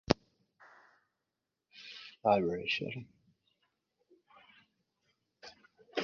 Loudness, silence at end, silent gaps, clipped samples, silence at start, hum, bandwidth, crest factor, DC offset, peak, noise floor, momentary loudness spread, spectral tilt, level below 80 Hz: -34 LUFS; 0 s; none; under 0.1%; 0.1 s; none; 7.2 kHz; 34 dB; under 0.1%; -4 dBFS; -88 dBFS; 24 LU; -3.5 dB/octave; -62 dBFS